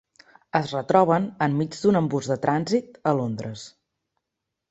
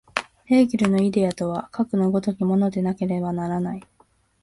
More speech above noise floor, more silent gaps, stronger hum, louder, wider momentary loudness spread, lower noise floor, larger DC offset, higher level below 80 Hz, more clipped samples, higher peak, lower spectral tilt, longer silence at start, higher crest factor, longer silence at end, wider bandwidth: first, 60 dB vs 40 dB; neither; neither; about the same, -23 LUFS vs -22 LUFS; first, 12 LU vs 9 LU; first, -83 dBFS vs -61 dBFS; neither; second, -64 dBFS vs -58 dBFS; neither; about the same, -4 dBFS vs -2 dBFS; about the same, -6.5 dB/octave vs -7.5 dB/octave; first, 0.55 s vs 0.15 s; about the same, 22 dB vs 22 dB; first, 1.05 s vs 0.6 s; second, 8.2 kHz vs 11.5 kHz